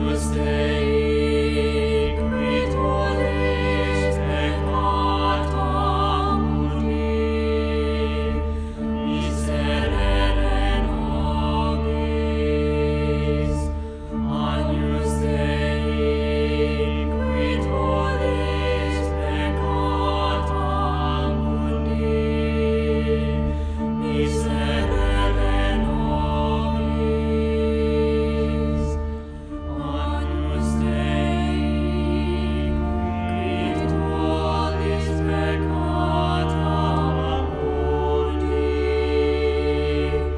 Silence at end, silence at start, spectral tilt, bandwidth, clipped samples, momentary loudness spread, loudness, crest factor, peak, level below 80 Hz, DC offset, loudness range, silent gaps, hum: 0 s; 0 s; -7 dB/octave; 11 kHz; under 0.1%; 3 LU; -22 LUFS; 14 dB; -8 dBFS; -26 dBFS; under 0.1%; 2 LU; none; none